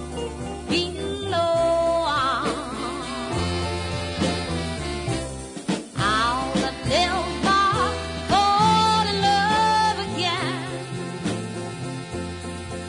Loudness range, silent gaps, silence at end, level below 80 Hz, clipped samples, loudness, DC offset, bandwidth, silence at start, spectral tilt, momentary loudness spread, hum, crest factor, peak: 6 LU; none; 0 s; -42 dBFS; under 0.1%; -23 LUFS; under 0.1%; 11 kHz; 0 s; -4.5 dB/octave; 12 LU; none; 16 dB; -8 dBFS